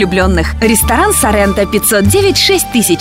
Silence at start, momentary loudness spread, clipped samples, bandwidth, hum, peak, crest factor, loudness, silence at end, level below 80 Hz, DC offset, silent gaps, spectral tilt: 0 s; 3 LU; under 0.1%; 16.5 kHz; none; 0 dBFS; 10 dB; -10 LUFS; 0 s; -22 dBFS; under 0.1%; none; -3.5 dB/octave